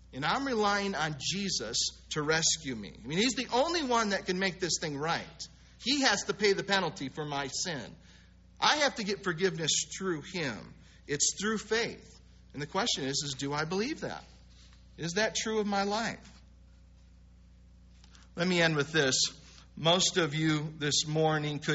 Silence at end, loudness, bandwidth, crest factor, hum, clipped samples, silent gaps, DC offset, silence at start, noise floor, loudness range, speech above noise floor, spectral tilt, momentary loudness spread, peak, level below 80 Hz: 0 s; -30 LUFS; 8 kHz; 22 dB; none; under 0.1%; none; under 0.1%; 0.1 s; -57 dBFS; 6 LU; 26 dB; -2.5 dB/octave; 12 LU; -10 dBFS; -58 dBFS